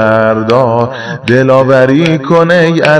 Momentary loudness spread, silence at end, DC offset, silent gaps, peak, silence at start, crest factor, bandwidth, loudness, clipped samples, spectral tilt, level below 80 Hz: 6 LU; 0 s; under 0.1%; none; 0 dBFS; 0 s; 8 dB; 11 kHz; -8 LUFS; 3%; -7 dB/octave; -46 dBFS